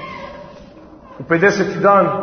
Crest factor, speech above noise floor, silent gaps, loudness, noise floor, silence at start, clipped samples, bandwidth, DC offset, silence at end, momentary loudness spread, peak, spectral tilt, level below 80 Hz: 16 dB; 26 dB; none; -14 LUFS; -40 dBFS; 0 s; under 0.1%; 6.6 kHz; under 0.1%; 0 s; 22 LU; 0 dBFS; -6 dB/octave; -50 dBFS